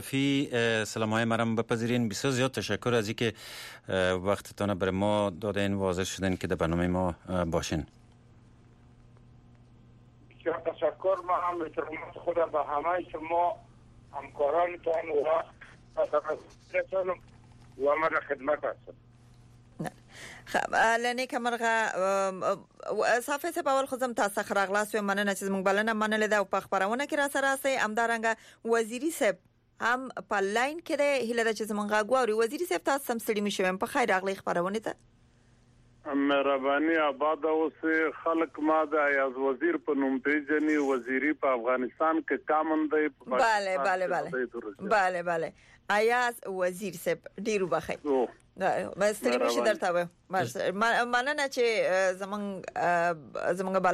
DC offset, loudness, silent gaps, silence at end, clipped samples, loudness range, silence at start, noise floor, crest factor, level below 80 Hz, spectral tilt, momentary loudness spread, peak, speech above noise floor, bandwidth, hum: under 0.1%; -29 LUFS; none; 0 s; under 0.1%; 4 LU; 0 s; -61 dBFS; 14 dB; -60 dBFS; -4.5 dB/octave; 8 LU; -16 dBFS; 33 dB; 15 kHz; none